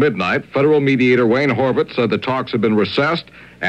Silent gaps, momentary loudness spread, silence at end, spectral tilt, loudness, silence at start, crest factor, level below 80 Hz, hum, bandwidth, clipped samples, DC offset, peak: none; 6 LU; 0 s; -7.5 dB/octave; -16 LUFS; 0 s; 12 dB; -54 dBFS; none; 8.6 kHz; under 0.1%; under 0.1%; -4 dBFS